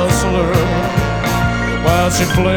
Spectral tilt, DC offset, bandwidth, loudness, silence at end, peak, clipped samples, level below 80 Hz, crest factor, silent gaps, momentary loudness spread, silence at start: -5 dB/octave; under 0.1%; over 20 kHz; -15 LUFS; 0 s; -2 dBFS; under 0.1%; -26 dBFS; 14 dB; none; 3 LU; 0 s